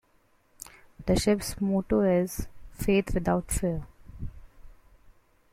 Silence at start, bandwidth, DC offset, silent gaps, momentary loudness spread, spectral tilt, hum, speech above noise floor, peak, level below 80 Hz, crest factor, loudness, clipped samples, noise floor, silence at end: 0.6 s; 16 kHz; under 0.1%; none; 21 LU; -5.5 dB/octave; none; 39 dB; -12 dBFS; -42 dBFS; 18 dB; -28 LUFS; under 0.1%; -65 dBFS; 0.8 s